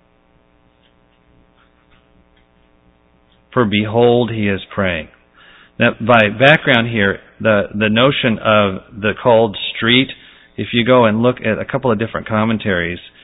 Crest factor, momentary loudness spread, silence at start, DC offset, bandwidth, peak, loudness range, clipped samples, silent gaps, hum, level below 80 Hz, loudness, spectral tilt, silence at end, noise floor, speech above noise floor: 16 dB; 8 LU; 3.5 s; under 0.1%; 5.6 kHz; 0 dBFS; 6 LU; under 0.1%; none; none; -44 dBFS; -15 LUFS; -8 dB/octave; 0.15 s; -54 dBFS; 40 dB